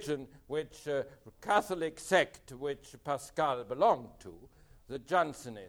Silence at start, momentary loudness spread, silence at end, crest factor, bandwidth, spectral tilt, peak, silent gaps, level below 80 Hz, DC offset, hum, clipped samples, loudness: 0 s; 16 LU; 0 s; 20 dB; over 20 kHz; -4 dB/octave; -14 dBFS; none; -64 dBFS; under 0.1%; none; under 0.1%; -33 LUFS